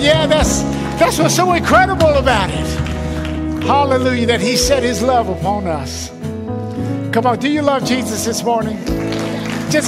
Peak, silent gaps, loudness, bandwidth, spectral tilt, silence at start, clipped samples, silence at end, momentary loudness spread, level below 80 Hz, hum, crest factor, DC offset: -2 dBFS; none; -16 LUFS; 16 kHz; -4.5 dB/octave; 0 s; under 0.1%; 0 s; 10 LU; -30 dBFS; none; 14 dB; under 0.1%